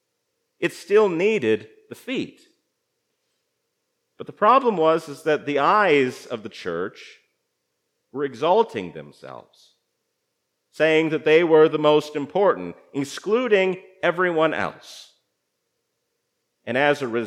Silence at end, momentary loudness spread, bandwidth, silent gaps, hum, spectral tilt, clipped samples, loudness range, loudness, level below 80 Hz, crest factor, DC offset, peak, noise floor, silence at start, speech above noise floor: 0 s; 20 LU; 12.5 kHz; none; none; -5.5 dB/octave; under 0.1%; 8 LU; -21 LUFS; -78 dBFS; 20 dB; under 0.1%; -4 dBFS; -76 dBFS; 0.6 s; 55 dB